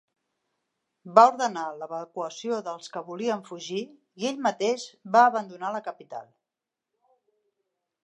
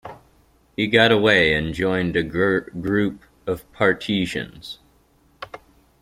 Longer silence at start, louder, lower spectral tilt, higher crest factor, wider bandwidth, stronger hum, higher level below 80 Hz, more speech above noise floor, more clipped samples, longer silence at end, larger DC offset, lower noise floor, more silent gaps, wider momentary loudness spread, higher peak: first, 1.05 s vs 0.05 s; second, -26 LUFS vs -20 LUFS; second, -4 dB/octave vs -5.5 dB/octave; about the same, 26 dB vs 22 dB; second, 10.5 kHz vs 15.5 kHz; neither; second, -86 dBFS vs -48 dBFS; first, 62 dB vs 38 dB; neither; first, 1.85 s vs 0.45 s; neither; first, -88 dBFS vs -58 dBFS; neither; second, 17 LU vs 23 LU; about the same, -2 dBFS vs -2 dBFS